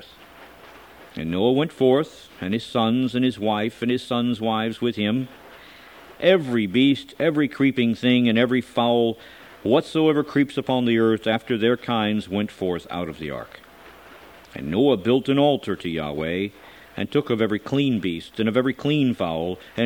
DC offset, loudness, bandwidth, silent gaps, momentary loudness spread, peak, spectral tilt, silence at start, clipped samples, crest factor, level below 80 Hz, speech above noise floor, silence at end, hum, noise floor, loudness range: under 0.1%; -22 LUFS; 16.5 kHz; none; 11 LU; -4 dBFS; -7 dB/octave; 0 s; under 0.1%; 18 dB; -56 dBFS; 24 dB; 0 s; none; -46 dBFS; 4 LU